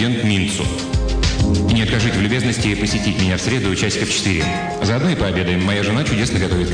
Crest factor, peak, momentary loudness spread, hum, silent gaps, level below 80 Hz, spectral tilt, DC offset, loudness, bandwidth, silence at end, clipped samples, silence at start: 12 dB; -4 dBFS; 3 LU; none; none; -28 dBFS; -5 dB/octave; under 0.1%; -18 LUFS; 10 kHz; 0 s; under 0.1%; 0 s